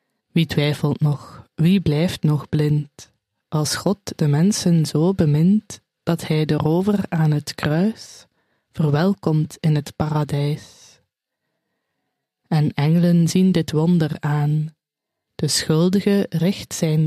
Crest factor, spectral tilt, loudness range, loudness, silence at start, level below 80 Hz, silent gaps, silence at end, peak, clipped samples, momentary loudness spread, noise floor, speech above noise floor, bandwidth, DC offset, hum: 16 dB; -6.5 dB/octave; 4 LU; -20 LUFS; 0.35 s; -52 dBFS; none; 0 s; -4 dBFS; under 0.1%; 8 LU; -82 dBFS; 64 dB; 14.5 kHz; under 0.1%; none